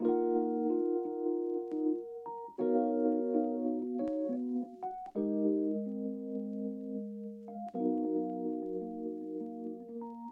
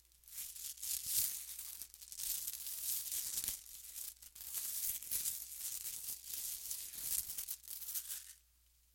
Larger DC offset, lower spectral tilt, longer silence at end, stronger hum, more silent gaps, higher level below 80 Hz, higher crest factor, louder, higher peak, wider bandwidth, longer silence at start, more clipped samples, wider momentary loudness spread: neither; first, -11 dB/octave vs 2 dB/octave; second, 0 s vs 0.55 s; neither; neither; second, -78 dBFS vs -70 dBFS; second, 16 dB vs 30 dB; first, -35 LUFS vs -40 LUFS; second, -18 dBFS vs -14 dBFS; second, 3.4 kHz vs 17 kHz; second, 0 s vs 0.25 s; neither; about the same, 12 LU vs 10 LU